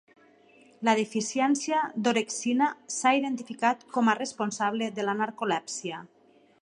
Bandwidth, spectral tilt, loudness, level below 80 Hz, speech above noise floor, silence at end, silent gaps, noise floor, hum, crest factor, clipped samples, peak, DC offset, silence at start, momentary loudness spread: 11.5 kHz; -3.5 dB/octave; -28 LUFS; -82 dBFS; 31 dB; 0.55 s; none; -58 dBFS; none; 20 dB; under 0.1%; -8 dBFS; under 0.1%; 0.8 s; 6 LU